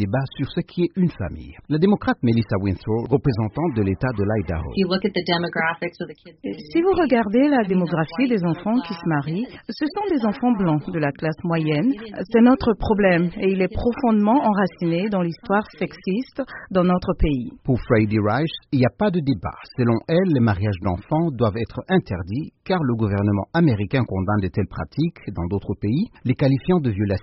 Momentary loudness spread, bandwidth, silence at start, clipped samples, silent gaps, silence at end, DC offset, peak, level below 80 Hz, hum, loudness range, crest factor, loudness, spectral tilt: 9 LU; 5.8 kHz; 0 s; under 0.1%; none; 0 s; under 0.1%; -4 dBFS; -40 dBFS; none; 3 LU; 18 dB; -21 LUFS; -6.5 dB/octave